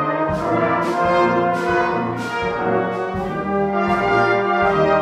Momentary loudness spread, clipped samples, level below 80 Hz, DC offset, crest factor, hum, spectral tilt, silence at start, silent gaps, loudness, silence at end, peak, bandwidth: 6 LU; under 0.1%; -44 dBFS; under 0.1%; 14 dB; none; -6.5 dB/octave; 0 s; none; -19 LUFS; 0 s; -4 dBFS; 12.5 kHz